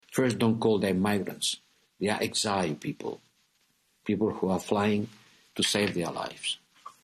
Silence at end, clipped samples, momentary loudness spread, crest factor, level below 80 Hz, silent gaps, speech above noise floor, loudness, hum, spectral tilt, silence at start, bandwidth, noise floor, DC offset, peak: 0.15 s; under 0.1%; 13 LU; 18 dB; -68 dBFS; none; 42 dB; -29 LUFS; none; -4.5 dB/octave; 0.1 s; 13.5 kHz; -70 dBFS; under 0.1%; -12 dBFS